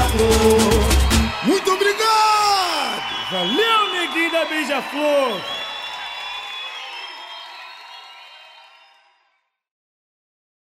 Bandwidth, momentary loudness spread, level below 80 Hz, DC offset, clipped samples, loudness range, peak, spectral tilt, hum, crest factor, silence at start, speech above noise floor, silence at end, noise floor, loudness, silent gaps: 16 kHz; 19 LU; -30 dBFS; under 0.1%; under 0.1%; 18 LU; -4 dBFS; -4 dB/octave; none; 18 dB; 0 s; 50 dB; 2.3 s; -68 dBFS; -18 LUFS; none